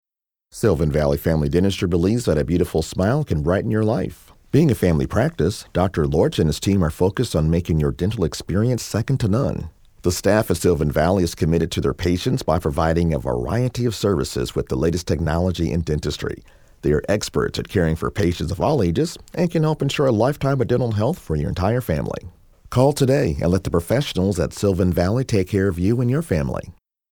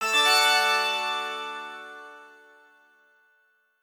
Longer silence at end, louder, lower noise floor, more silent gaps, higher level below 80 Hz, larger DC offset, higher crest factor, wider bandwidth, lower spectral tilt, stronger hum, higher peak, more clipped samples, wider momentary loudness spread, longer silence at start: second, 0.45 s vs 1.55 s; about the same, -21 LUFS vs -22 LUFS; about the same, -66 dBFS vs -67 dBFS; neither; first, -36 dBFS vs -86 dBFS; neither; about the same, 18 dB vs 20 dB; about the same, 20 kHz vs over 20 kHz; first, -6.5 dB/octave vs 2.5 dB/octave; neither; first, -2 dBFS vs -8 dBFS; neither; second, 5 LU vs 23 LU; first, 0.55 s vs 0 s